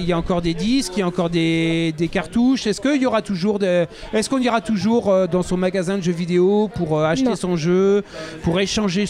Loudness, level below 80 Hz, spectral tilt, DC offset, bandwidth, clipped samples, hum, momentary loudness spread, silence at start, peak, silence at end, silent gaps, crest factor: -19 LUFS; -42 dBFS; -6 dB/octave; under 0.1%; 13 kHz; under 0.1%; none; 5 LU; 0 s; -8 dBFS; 0 s; none; 12 dB